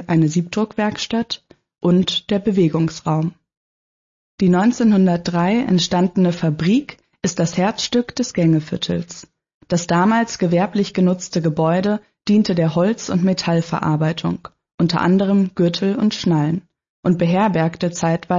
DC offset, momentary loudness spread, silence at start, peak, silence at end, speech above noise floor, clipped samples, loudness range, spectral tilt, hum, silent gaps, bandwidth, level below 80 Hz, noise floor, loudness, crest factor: under 0.1%; 7 LU; 0 s; -6 dBFS; 0 s; over 73 dB; under 0.1%; 3 LU; -6 dB/octave; none; 3.57-4.38 s, 9.54-9.61 s, 14.74-14.78 s, 16.89-17.03 s; 7.6 kHz; -54 dBFS; under -90 dBFS; -18 LUFS; 12 dB